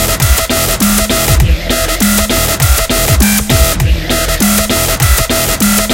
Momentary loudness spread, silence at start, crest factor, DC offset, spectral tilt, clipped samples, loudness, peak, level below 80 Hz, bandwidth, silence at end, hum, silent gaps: 3 LU; 0 s; 10 dB; under 0.1%; -3.5 dB/octave; 0.2%; -10 LUFS; 0 dBFS; -16 dBFS; 17.5 kHz; 0 s; none; none